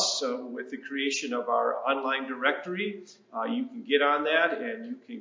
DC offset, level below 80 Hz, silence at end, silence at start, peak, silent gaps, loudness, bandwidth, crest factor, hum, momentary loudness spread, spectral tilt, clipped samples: under 0.1%; -90 dBFS; 0 s; 0 s; -8 dBFS; none; -28 LUFS; 7.6 kHz; 20 dB; none; 14 LU; -2 dB/octave; under 0.1%